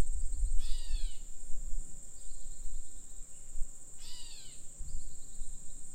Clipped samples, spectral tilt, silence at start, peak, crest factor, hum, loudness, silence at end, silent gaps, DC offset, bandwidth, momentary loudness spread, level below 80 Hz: under 0.1%; -2.5 dB/octave; 0 s; -14 dBFS; 16 dB; none; -45 LUFS; 0 s; none; under 0.1%; 9.4 kHz; 10 LU; -38 dBFS